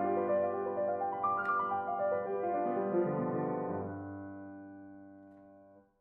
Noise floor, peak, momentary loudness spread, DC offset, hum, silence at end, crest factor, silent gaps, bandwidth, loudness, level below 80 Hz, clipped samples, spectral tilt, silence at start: -60 dBFS; -20 dBFS; 18 LU; under 0.1%; none; 0.2 s; 14 dB; none; 3.8 kHz; -34 LUFS; -80 dBFS; under 0.1%; -8 dB/octave; 0 s